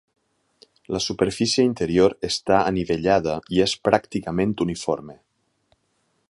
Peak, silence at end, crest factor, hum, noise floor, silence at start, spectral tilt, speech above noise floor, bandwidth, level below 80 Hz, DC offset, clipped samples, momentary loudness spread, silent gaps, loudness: 0 dBFS; 1.15 s; 22 dB; none; -69 dBFS; 0.9 s; -5 dB/octave; 48 dB; 11.5 kHz; -48 dBFS; under 0.1%; under 0.1%; 7 LU; none; -22 LUFS